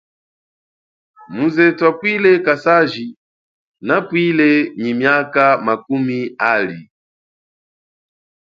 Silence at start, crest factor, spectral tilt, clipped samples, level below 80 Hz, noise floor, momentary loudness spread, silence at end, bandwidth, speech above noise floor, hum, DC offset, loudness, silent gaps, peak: 1.3 s; 18 dB; -7.5 dB/octave; under 0.1%; -66 dBFS; under -90 dBFS; 11 LU; 1.7 s; 7.2 kHz; over 75 dB; none; under 0.1%; -15 LUFS; 3.17-3.74 s; 0 dBFS